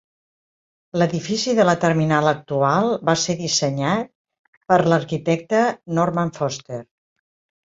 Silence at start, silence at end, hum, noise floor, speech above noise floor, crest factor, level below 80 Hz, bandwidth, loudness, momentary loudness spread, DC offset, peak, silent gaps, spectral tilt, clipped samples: 0.95 s; 0.8 s; none; under -90 dBFS; over 71 dB; 18 dB; -58 dBFS; 7.8 kHz; -20 LUFS; 9 LU; under 0.1%; -2 dBFS; 4.15-4.25 s, 4.39-4.61 s; -5 dB/octave; under 0.1%